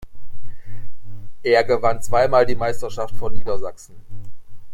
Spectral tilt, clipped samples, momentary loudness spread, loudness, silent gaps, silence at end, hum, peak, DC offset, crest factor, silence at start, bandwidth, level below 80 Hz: -5 dB/octave; under 0.1%; 26 LU; -21 LUFS; none; 0 s; none; -2 dBFS; under 0.1%; 14 dB; 0 s; 15.5 kHz; -38 dBFS